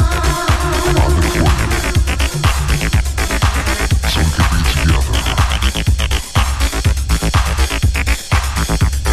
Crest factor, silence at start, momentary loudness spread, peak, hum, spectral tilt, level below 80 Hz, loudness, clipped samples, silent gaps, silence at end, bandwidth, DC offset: 14 dB; 0 s; 3 LU; 0 dBFS; none; -4.5 dB/octave; -16 dBFS; -15 LUFS; under 0.1%; none; 0 s; 14 kHz; under 0.1%